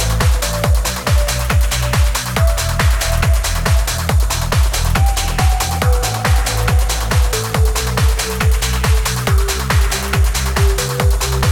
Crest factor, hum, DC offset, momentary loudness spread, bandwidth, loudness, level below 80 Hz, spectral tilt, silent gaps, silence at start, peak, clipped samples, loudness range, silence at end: 14 dB; none; under 0.1%; 1 LU; 18 kHz; -16 LUFS; -16 dBFS; -4 dB/octave; none; 0 s; 0 dBFS; under 0.1%; 0 LU; 0 s